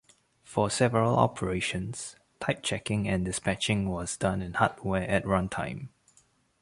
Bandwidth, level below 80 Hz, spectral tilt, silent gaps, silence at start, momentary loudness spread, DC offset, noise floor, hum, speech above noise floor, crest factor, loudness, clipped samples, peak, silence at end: 11.5 kHz; -50 dBFS; -5 dB/octave; none; 0.5 s; 11 LU; under 0.1%; -65 dBFS; none; 37 dB; 22 dB; -29 LUFS; under 0.1%; -8 dBFS; 0.75 s